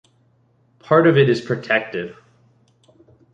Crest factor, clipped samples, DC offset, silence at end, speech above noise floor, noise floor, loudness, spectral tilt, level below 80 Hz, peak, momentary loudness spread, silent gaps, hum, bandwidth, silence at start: 18 dB; under 0.1%; under 0.1%; 1.2 s; 43 dB; -60 dBFS; -17 LUFS; -7.5 dB/octave; -62 dBFS; -2 dBFS; 15 LU; none; none; 8 kHz; 0.9 s